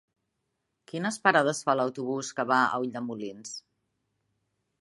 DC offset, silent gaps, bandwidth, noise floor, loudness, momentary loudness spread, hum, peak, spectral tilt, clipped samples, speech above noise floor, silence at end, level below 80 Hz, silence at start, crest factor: under 0.1%; none; 11.5 kHz; -80 dBFS; -27 LUFS; 17 LU; none; -6 dBFS; -4 dB/octave; under 0.1%; 53 dB; 1.2 s; -80 dBFS; 0.95 s; 26 dB